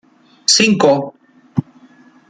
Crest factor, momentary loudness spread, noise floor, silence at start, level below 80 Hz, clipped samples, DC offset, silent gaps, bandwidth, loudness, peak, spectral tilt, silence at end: 18 dB; 13 LU; -47 dBFS; 0.5 s; -60 dBFS; under 0.1%; under 0.1%; none; 9.6 kHz; -14 LUFS; 0 dBFS; -3 dB/octave; 0.7 s